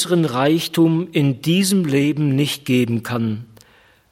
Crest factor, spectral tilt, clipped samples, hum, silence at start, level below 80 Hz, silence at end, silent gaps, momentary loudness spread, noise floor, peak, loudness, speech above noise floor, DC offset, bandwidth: 14 dB; -5.5 dB/octave; under 0.1%; none; 0 s; -60 dBFS; 0.65 s; none; 6 LU; -53 dBFS; -4 dBFS; -18 LUFS; 35 dB; under 0.1%; 16.5 kHz